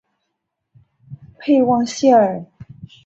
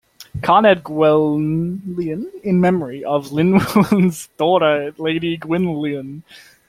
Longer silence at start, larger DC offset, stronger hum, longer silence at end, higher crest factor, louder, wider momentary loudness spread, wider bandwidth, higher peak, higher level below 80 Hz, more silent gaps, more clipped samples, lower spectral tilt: first, 1.1 s vs 0.2 s; neither; neither; about the same, 0.2 s vs 0.3 s; about the same, 18 dB vs 16 dB; about the same, -15 LUFS vs -17 LUFS; first, 14 LU vs 10 LU; second, 8.2 kHz vs 16 kHz; about the same, -2 dBFS vs 0 dBFS; second, -58 dBFS vs -52 dBFS; neither; neither; second, -5.5 dB/octave vs -7 dB/octave